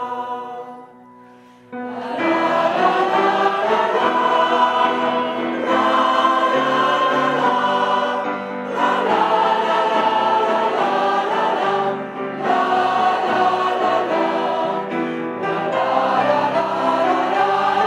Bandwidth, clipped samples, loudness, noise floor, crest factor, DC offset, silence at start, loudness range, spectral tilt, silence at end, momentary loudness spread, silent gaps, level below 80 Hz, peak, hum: 12.5 kHz; under 0.1%; -18 LUFS; -45 dBFS; 16 dB; under 0.1%; 0 s; 2 LU; -4.5 dB/octave; 0 s; 8 LU; none; -70 dBFS; -2 dBFS; none